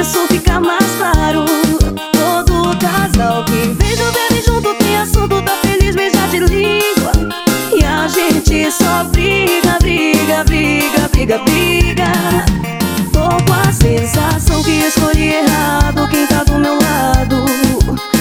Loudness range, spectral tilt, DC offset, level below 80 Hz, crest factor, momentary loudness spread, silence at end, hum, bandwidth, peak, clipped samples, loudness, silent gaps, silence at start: 1 LU; -4.5 dB/octave; under 0.1%; -20 dBFS; 12 dB; 2 LU; 0 s; none; 20 kHz; 0 dBFS; 0.1%; -12 LUFS; none; 0 s